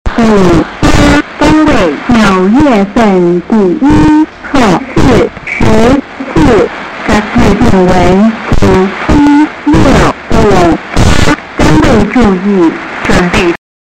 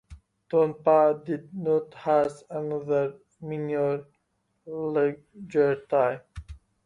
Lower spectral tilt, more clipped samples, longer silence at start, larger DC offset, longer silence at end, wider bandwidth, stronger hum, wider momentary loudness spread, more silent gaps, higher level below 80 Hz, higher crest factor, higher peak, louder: second, -6 dB/octave vs -8 dB/octave; neither; about the same, 0.05 s vs 0.1 s; neither; about the same, 0.3 s vs 0.3 s; first, 14 kHz vs 10.5 kHz; neither; second, 5 LU vs 16 LU; neither; first, -18 dBFS vs -56 dBFS; second, 6 dB vs 18 dB; first, 0 dBFS vs -10 dBFS; first, -7 LUFS vs -26 LUFS